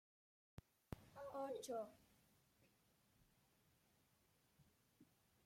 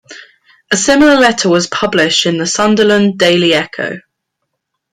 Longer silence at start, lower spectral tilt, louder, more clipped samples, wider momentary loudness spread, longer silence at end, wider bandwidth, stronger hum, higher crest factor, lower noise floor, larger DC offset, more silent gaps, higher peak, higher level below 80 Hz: first, 0.9 s vs 0.1 s; first, -5 dB/octave vs -3.5 dB/octave; second, -52 LUFS vs -11 LUFS; neither; first, 18 LU vs 10 LU; second, 0.4 s vs 0.95 s; first, 16.5 kHz vs 14.5 kHz; neither; first, 24 dB vs 12 dB; first, -80 dBFS vs -72 dBFS; neither; neither; second, -34 dBFS vs 0 dBFS; second, -78 dBFS vs -46 dBFS